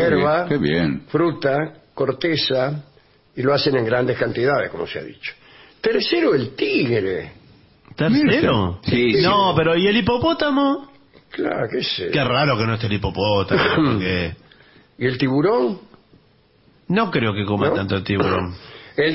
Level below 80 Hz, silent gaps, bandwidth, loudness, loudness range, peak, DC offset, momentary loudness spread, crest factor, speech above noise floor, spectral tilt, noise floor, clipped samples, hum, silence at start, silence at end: -48 dBFS; none; 6 kHz; -19 LUFS; 4 LU; -6 dBFS; under 0.1%; 12 LU; 14 dB; 37 dB; -9.5 dB/octave; -56 dBFS; under 0.1%; none; 0 s; 0 s